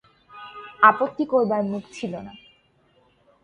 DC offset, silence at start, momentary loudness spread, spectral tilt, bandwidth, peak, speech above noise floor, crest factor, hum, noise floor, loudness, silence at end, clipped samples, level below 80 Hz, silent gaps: under 0.1%; 0.35 s; 24 LU; -6 dB/octave; 10 kHz; 0 dBFS; 40 dB; 24 dB; none; -62 dBFS; -21 LUFS; 1.05 s; under 0.1%; -66 dBFS; none